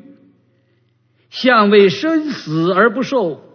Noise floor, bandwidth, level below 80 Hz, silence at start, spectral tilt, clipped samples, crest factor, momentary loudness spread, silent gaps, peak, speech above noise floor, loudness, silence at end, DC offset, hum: -59 dBFS; 6.6 kHz; -68 dBFS; 1.35 s; -6 dB/octave; under 0.1%; 16 dB; 9 LU; none; 0 dBFS; 45 dB; -14 LUFS; 0.2 s; under 0.1%; none